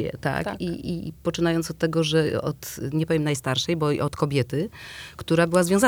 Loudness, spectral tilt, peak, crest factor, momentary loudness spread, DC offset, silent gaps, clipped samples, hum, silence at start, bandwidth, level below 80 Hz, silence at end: -25 LUFS; -5.5 dB/octave; -6 dBFS; 18 dB; 10 LU; under 0.1%; none; under 0.1%; none; 0 s; over 20 kHz; -50 dBFS; 0 s